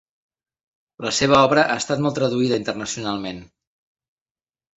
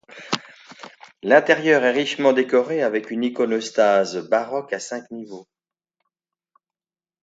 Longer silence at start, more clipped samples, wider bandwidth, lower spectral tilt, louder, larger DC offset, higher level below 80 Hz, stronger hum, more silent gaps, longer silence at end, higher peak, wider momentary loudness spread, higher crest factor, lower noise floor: first, 1 s vs 0.15 s; neither; about the same, 8.2 kHz vs 8 kHz; about the same, -4 dB/octave vs -4 dB/octave; about the same, -20 LUFS vs -20 LUFS; neither; first, -54 dBFS vs -74 dBFS; neither; neither; second, 1.3 s vs 1.8 s; about the same, 0 dBFS vs 0 dBFS; second, 14 LU vs 19 LU; about the same, 22 dB vs 22 dB; about the same, under -90 dBFS vs under -90 dBFS